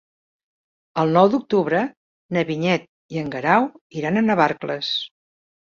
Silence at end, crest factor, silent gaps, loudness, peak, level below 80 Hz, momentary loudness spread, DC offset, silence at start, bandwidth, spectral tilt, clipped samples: 0.7 s; 20 dB; 1.97-2.29 s, 2.89-3.09 s, 3.81-3.90 s; -21 LUFS; -2 dBFS; -62 dBFS; 12 LU; under 0.1%; 0.95 s; 7.4 kHz; -6.5 dB/octave; under 0.1%